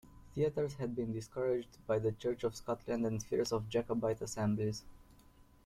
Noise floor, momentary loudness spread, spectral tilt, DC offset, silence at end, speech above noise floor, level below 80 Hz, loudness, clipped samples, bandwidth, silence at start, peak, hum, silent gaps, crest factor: -62 dBFS; 5 LU; -6 dB/octave; under 0.1%; 0.25 s; 26 dB; -60 dBFS; -37 LUFS; under 0.1%; 15 kHz; 0.05 s; -22 dBFS; none; none; 14 dB